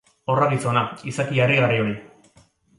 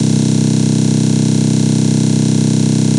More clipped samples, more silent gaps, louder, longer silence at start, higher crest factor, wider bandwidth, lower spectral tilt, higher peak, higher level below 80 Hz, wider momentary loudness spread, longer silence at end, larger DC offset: neither; neither; second, -21 LUFS vs -13 LUFS; first, 0.3 s vs 0 s; first, 18 dB vs 10 dB; about the same, 11.5 kHz vs 11.5 kHz; about the same, -6 dB/octave vs -6 dB/octave; second, -6 dBFS vs -2 dBFS; second, -60 dBFS vs -44 dBFS; first, 10 LU vs 0 LU; first, 0.7 s vs 0 s; neither